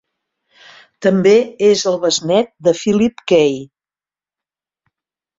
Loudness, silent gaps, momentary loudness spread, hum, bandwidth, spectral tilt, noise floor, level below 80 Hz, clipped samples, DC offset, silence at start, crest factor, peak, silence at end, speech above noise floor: -14 LUFS; none; 5 LU; none; 7.8 kHz; -4.5 dB/octave; under -90 dBFS; -56 dBFS; under 0.1%; under 0.1%; 1 s; 16 dB; -2 dBFS; 1.75 s; over 76 dB